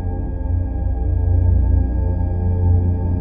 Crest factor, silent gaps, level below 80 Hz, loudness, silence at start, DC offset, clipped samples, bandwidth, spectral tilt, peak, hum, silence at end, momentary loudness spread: 12 dB; none; -22 dBFS; -19 LUFS; 0 s; under 0.1%; under 0.1%; 1.8 kHz; -14 dB/octave; -6 dBFS; none; 0 s; 6 LU